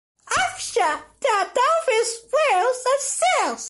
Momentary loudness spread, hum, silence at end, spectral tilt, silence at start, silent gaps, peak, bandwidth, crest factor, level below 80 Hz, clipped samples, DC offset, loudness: 4 LU; none; 0 s; 0 dB/octave; 0.25 s; none; -8 dBFS; 12 kHz; 12 dB; -62 dBFS; under 0.1%; under 0.1%; -21 LUFS